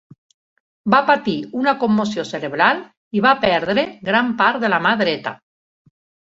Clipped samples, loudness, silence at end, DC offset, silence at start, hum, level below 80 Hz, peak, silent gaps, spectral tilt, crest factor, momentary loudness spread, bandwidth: under 0.1%; -18 LUFS; 0.85 s; under 0.1%; 0.85 s; none; -58 dBFS; -2 dBFS; 2.97-3.11 s; -5.5 dB/octave; 18 dB; 10 LU; 7.8 kHz